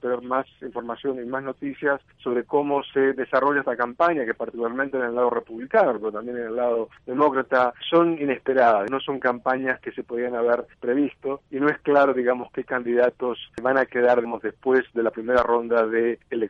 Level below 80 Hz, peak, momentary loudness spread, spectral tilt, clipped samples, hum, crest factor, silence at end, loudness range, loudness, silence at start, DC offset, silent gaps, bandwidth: -62 dBFS; -6 dBFS; 9 LU; -7 dB/octave; under 0.1%; none; 18 dB; 0 s; 3 LU; -23 LUFS; 0.05 s; under 0.1%; none; 6.4 kHz